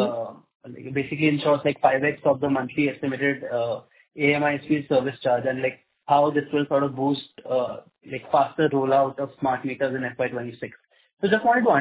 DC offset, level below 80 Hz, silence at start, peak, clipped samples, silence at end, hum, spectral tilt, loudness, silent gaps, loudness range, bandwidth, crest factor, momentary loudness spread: under 0.1%; -64 dBFS; 0 s; -6 dBFS; under 0.1%; 0 s; none; -10 dB/octave; -24 LUFS; 0.55-0.60 s, 11.13-11.17 s; 2 LU; 4 kHz; 18 dB; 12 LU